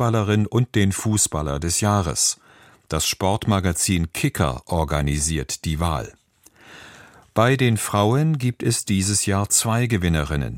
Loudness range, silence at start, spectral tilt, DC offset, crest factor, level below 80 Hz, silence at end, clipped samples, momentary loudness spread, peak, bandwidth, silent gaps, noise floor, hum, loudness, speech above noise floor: 4 LU; 0 s; -4.5 dB/octave; under 0.1%; 18 dB; -36 dBFS; 0 s; under 0.1%; 7 LU; -2 dBFS; 16.5 kHz; none; -53 dBFS; none; -21 LUFS; 32 dB